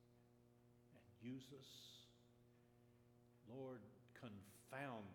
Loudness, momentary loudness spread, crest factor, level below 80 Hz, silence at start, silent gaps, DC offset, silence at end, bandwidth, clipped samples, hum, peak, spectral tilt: -58 LUFS; 10 LU; 22 dB; -88 dBFS; 0 s; none; under 0.1%; 0 s; 19 kHz; under 0.1%; none; -38 dBFS; -5.5 dB/octave